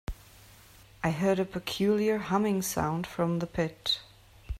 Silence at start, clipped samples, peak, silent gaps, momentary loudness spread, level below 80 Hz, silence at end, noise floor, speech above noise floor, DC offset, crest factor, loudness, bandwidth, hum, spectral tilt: 0.1 s; under 0.1%; -12 dBFS; none; 6 LU; -48 dBFS; 0 s; -55 dBFS; 26 dB; under 0.1%; 18 dB; -29 LUFS; 16 kHz; none; -5 dB/octave